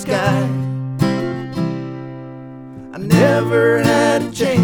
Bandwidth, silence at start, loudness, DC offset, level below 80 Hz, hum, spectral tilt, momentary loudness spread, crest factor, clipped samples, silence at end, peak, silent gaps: 20 kHz; 0 s; -17 LUFS; under 0.1%; -50 dBFS; none; -6.5 dB/octave; 19 LU; 16 dB; under 0.1%; 0 s; 0 dBFS; none